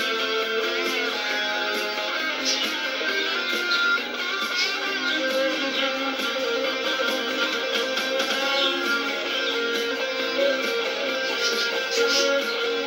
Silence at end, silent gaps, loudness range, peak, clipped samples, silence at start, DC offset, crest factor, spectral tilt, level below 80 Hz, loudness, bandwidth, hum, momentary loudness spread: 0 s; none; 1 LU; -8 dBFS; under 0.1%; 0 s; under 0.1%; 16 dB; -0.5 dB/octave; -74 dBFS; -23 LUFS; 17 kHz; none; 4 LU